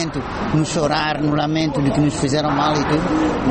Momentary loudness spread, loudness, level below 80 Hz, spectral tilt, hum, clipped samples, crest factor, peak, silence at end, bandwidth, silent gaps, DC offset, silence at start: 2 LU; -19 LUFS; -38 dBFS; -5.5 dB/octave; none; under 0.1%; 14 dB; -6 dBFS; 0 s; 8.8 kHz; none; under 0.1%; 0 s